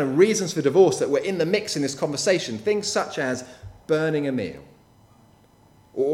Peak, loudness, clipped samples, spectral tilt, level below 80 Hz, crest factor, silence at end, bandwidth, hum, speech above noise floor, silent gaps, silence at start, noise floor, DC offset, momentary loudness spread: -4 dBFS; -23 LUFS; under 0.1%; -4.5 dB/octave; -60 dBFS; 20 dB; 0 s; 14.5 kHz; none; 33 dB; none; 0 s; -55 dBFS; under 0.1%; 14 LU